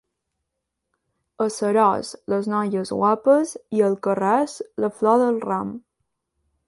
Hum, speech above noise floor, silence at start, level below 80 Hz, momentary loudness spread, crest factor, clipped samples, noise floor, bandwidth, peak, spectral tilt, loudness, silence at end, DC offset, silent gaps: none; 60 dB; 1.4 s; -66 dBFS; 9 LU; 16 dB; under 0.1%; -80 dBFS; 11.5 kHz; -6 dBFS; -6 dB/octave; -21 LUFS; 0.9 s; under 0.1%; none